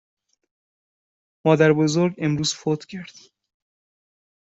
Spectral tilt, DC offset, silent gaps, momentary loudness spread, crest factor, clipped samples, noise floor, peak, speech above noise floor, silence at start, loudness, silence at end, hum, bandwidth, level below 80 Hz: -5.5 dB/octave; under 0.1%; none; 13 LU; 22 dB; under 0.1%; under -90 dBFS; -4 dBFS; over 70 dB; 1.45 s; -21 LUFS; 1.45 s; none; 8 kHz; -62 dBFS